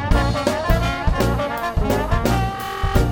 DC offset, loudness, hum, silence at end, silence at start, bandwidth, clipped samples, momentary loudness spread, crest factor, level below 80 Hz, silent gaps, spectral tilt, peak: under 0.1%; -21 LUFS; none; 0 s; 0 s; 19.5 kHz; under 0.1%; 3 LU; 16 dB; -24 dBFS; none; -6 dB/octave; -2 dBFS